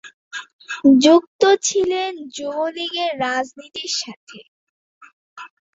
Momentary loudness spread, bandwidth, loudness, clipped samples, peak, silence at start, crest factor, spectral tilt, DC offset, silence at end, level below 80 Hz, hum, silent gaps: 20 LU; 8 kHz; -18 LUFS; under 0.1%; -2 dBFS; 0.05 s; 18 dB; -2.5 dB/octave; under 0.1%; 0.25 s; -64 dBFS; none; 0.13-0.31 s, 0.53-0.59 s, 1.27-1.39 s, 4.16-4.27 s, 4.48-5.01 s, 5.13-5.36 s